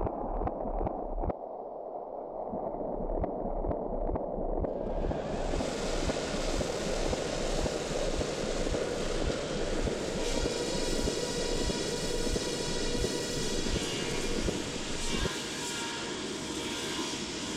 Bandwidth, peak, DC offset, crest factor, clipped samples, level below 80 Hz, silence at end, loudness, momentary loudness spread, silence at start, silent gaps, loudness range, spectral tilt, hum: 14.5 kHz; -18 dBFS; under 0.1%; 14 dB; under 0.1%; -38 dBFS; 0 s; -33 LUFS; 4 LU; 0 s; none; 4 LU; -4 dB/octave; none